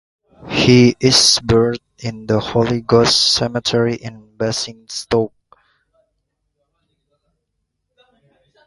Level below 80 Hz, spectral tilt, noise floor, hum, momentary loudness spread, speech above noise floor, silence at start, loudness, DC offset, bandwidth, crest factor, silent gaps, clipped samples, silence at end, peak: -44 dBFS; -4 dB/octave; -73 dBFS; none; 16 LU; 58 dB; 0.45 s; -15 LUFS; under 0.1%; 11.5 kHz; 18 dB; none; under 0.1%; 3.4 s; 0 dBFS